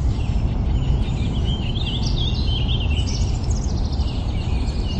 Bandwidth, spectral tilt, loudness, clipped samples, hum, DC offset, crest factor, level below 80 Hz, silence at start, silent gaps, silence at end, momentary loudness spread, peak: 8.6 kHz; -6 dB/octave; -23 LUFS; under 0.1%; none; under 0.1%; 12 dB; -22 dBFS; 0 s; none; 0 s; 3 LU; -8 dBFS